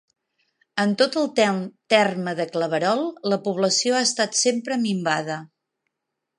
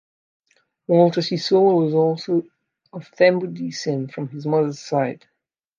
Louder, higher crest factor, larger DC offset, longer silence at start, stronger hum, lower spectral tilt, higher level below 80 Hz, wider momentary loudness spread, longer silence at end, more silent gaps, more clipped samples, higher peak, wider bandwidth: about the same, -22 LUFS vs -20 LUFS; about the same, 20 dB vs 18 dB; neither; second, 0.75 s vs 0.9 s; neither; second, -3.5 dB/octave vs -6.5 dB/octave; about the same, -76 dBFS vs -74 dBFS; second, 7 LU vs 18 LU; first, 0.95 s vs 0.65 s; neither; neither; about the same, -2 dBFS vs -2 dBFS; first, 11.5 kHz vs 7.6 kHz